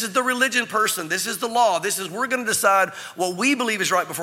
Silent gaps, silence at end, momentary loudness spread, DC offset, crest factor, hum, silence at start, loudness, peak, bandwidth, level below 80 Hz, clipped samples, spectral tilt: none; 0 s; 6 LU; under 0.1%; 18 dB; none; 0 s; -21 LUFS; -4 dBFS; 17 kHz; -74 dBFS; under 0.1%; -2 dB/octave